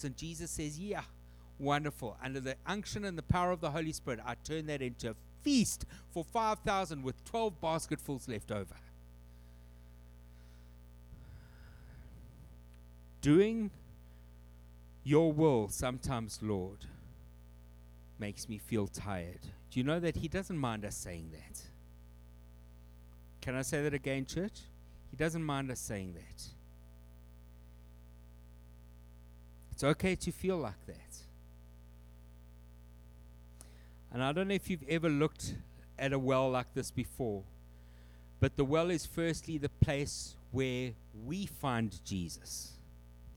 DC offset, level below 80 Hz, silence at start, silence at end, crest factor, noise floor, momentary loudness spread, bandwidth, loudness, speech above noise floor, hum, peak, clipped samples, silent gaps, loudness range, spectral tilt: under 0.1%; -54 dBFS; 0 s; 0 s; 26 dB; -55 dBFS; 26 LU; over 20 kHz; -36 LUFS; 20 dB; 60 Hz at -55 dBFS; -12 dBFS; under 0.1%; none; 12 LU; -5.5 dB/octave